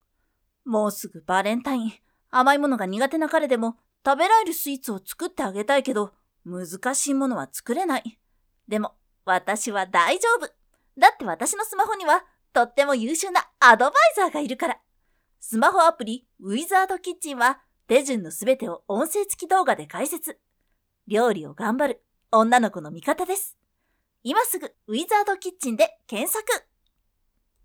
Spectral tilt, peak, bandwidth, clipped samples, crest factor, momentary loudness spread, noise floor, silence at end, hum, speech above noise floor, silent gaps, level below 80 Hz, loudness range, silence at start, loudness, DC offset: -3 dB/octave; 0 dBFS; over 20 kHz; under 0.1%; 24 dB; 13 LU; -73 dBFS; 1.05 s; none; 51 dB; none; -68 dBFS; 6 LU; 0.65 s; -23 LUFS; under 0.1%